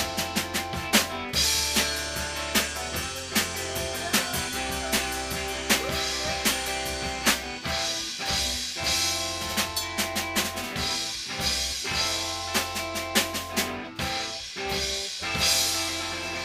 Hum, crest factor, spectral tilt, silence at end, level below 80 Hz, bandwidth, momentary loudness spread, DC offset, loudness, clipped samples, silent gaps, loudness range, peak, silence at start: none; 22 dB; -1.5 dB/octave; 0 s; -44 dBFS; 15.5 kHz; 6 LU; under 0.1%; -26 LUFS; under 0.1%; none; 2 LU; -6 dBFS; 0 s